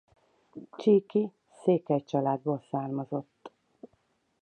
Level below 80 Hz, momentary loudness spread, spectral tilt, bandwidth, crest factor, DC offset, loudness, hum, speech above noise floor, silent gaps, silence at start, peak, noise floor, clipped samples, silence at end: -80 dBFS; 22 LU; -9 dB/octave; 9 kHz; 18 dB; under 0.1%; -29 LUFS; none; 44 dB; none; 0.55 s; -12 dBFS; -72 dBFS; under 0.1%; 0.95 s